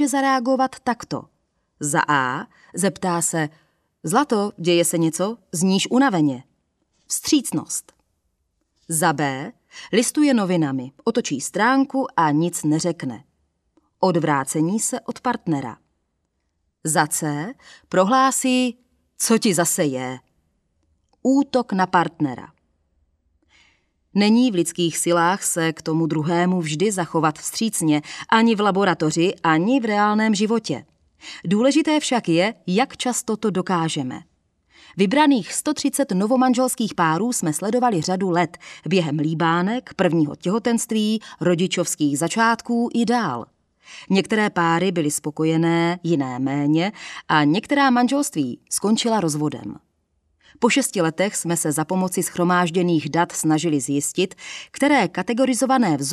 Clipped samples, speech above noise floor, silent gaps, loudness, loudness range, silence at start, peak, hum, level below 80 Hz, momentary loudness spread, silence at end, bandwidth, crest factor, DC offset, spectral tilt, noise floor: under 0.1%; 52 dB; none; -20 LUFS; 4 LU; 0 s; 0 dBFS; none; -66 dBFS; 9 LU; 0 s; 14.5 kHz; 20 dB; under 0.1%; -4.5 dB/octave; -72 dBFS